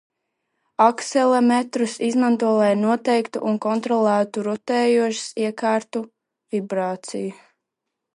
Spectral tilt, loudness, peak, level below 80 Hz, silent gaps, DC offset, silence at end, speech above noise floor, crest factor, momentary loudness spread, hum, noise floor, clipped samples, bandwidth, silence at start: -5 dB/octave; -21 LUFS; -2 dBFS; -76 dBFS; none; under 0.1%; 0.85 s; 62 dB; 20 dB; 11 LU; none; -82 dBFS; under 0.1%; 11 kHz; 0.8 s